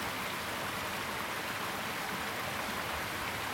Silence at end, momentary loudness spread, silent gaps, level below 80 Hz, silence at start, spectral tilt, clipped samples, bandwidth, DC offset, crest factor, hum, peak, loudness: 0 s; 0 LU; none; -58 dBFS; 0 s; -2.5 dB/octave; under 0.1%; over 20 kHz; under 0.1%; 14 dB; none; -22 dBFS; -36 LUFS